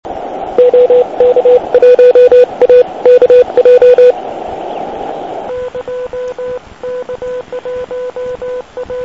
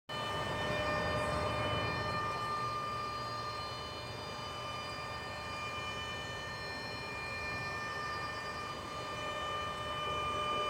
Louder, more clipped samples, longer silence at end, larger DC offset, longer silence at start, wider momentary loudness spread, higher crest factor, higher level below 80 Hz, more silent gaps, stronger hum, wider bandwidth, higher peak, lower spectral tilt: first, -7 LUFS vs -38 LUFS; first, 2% vs under 0.1%; about the same, 0 s vs 0 s; first, 0.4% vs under 0.1%; about the same, 0.05 s vs 0.1 s; first, 17 LU vs 7 LU; about the same, 10 dB vs 14 dB; first, -44 dBFS vs -56 dBFS; neither; neither; second, 6 kHz vs 16 kHz; first, 0 dBFS vs -24 dBFS; first, -5.5 dB/octave vs -4 dB/octave